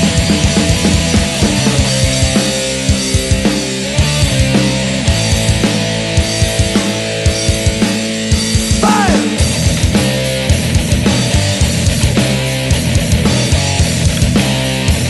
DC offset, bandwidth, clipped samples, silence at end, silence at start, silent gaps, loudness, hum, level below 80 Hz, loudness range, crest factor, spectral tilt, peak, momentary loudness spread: under 0.1%; 12.5 kHz; under 0.1%; 0 s; 0 s; none; -13 LUFS; none; -22 dBFS; 1 LU; 12 dB; -4.5 dB/octave; 0 dBFS; 3 LU